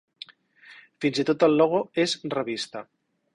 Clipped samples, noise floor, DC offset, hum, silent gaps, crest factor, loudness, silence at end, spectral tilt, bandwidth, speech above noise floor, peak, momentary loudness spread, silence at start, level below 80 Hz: under 0.1%; -53 dBFS; under 0.1%; none; none; 20 dB; -24 LUFS; 0.5 s; -5 dB/octave; 11.5 kHz; 29 dB; -6 dBFS; 23 LU; 0.7 s; -68 dBFS